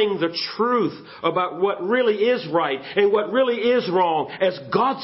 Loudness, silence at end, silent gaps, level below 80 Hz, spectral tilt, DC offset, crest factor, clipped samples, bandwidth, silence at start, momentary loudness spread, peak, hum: -21 LUFS; 0 s; none; -68 dBFS; -9 dB/octave; under 0.1%; 16 dB; under 0.1%; 5.8 kHz; 0 s; 4 LU; -6 dBFS; none